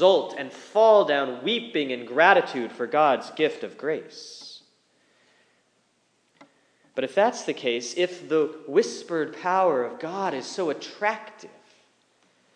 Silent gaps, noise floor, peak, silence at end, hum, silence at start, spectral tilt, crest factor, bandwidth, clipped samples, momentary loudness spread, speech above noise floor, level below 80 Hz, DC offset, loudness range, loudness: none; -68 dBFS; -2 dBFS; 1.1 s; none; 0 s; -3.5 dB/octave; 22 dB; 10 kHz; under 0.1%; 15 LU; 44 dB; under -90 dBFS; under 0.1%; 12 LU; -24 LUFS